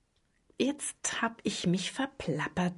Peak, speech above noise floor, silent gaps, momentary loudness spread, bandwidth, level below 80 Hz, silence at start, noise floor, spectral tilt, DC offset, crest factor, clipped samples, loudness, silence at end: -14 dBFS; 40 dB; none; 4 LU; 11.5 kHz; -62 dBFS; 0.6 s; -72 dBFS; -4 dB/octave; under 0.1%; 18 dB; under 0.1%; -33 LUFS; 0 s